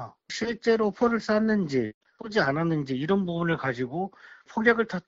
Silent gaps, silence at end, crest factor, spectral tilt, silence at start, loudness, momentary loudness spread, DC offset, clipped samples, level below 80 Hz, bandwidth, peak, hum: 1.94-2.01 s; 0.05 s; 20 dB; -5 dB/octave; 0 s; -26 LUFS; 11 LU; under 0.1%; under 0.1%; -60 dBFS; 7.8 kHz; -8 dBFS; none